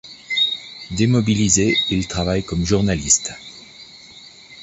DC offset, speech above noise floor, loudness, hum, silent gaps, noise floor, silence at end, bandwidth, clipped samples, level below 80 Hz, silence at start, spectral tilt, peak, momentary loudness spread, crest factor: under 0.1%; 25 dB; -18 LUFS; none; none; -43 dBFS; 0 s; 8.2 kHz; under 0.1%; -38 dBFS; 0.05 s; -3.5 dB/octave; -2 dBFS; 23 LU; 18 dB